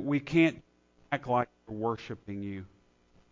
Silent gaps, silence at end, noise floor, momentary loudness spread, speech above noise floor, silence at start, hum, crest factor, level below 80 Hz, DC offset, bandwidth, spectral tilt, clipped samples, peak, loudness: none; 0.65 s; -64 dBFS; 15 LU; 34 dB; 0 s; none; 18 dB; -62 dBFS; under 0.1%; 7.6 kHz; -7.5 dB/octave; under 0.1%; -14 dBFS; -31 LUFS